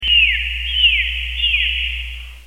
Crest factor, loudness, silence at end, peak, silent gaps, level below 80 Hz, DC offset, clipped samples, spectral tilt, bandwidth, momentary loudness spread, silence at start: 14 dB; -15 LUFS; 0 s; -4 dBFS; none; -28 dBFS; 0.4%; under 0.1%; -1 dB/octave; 16 kHz; 11 LU; 0 s